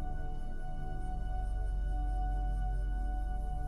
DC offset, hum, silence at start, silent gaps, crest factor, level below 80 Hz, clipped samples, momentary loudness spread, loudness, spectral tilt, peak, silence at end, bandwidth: under 0.1%; none; 0 s; none; 8 dB; -34 dBFS; under 0.1%; 7 LU; -39 LUFS; -7.5 dB/octave; -26 dBFS; 0 s; 3.1 kHz